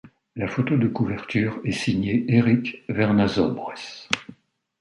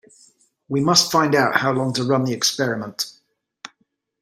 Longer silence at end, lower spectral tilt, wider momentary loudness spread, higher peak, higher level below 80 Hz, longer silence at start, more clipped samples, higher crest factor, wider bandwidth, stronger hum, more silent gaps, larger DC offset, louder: about the same, 0.45 s vs 0.55 s; first, -6.5 dB/octave vs -3.5 dB/octave; second, 11 LU vs 25 LU; about the same, 0 dBFS vs 0 dBFS; first, -52 dBFS vs -64 dBFS; second, 0.05 s vs 0.7 s; neither; about the same, 22 dB vs 22 dB; second, 11.5 kHz vs 16 kHz; neither; neither; neither; second, -23 LUFS vs -19 LUFS